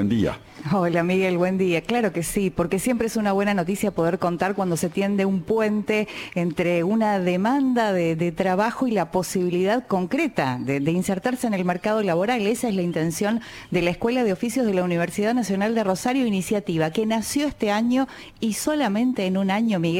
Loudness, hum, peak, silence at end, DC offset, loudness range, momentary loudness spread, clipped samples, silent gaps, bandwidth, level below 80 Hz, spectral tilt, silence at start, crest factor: -23 LUFS; none; -6 dBFS; 0 s; under 0.1%; 1 LU; 3 LU; under 0.1%; none; 17 kHz; -52 dBFS; -5.5 dB/octave; 0 s; 16 dB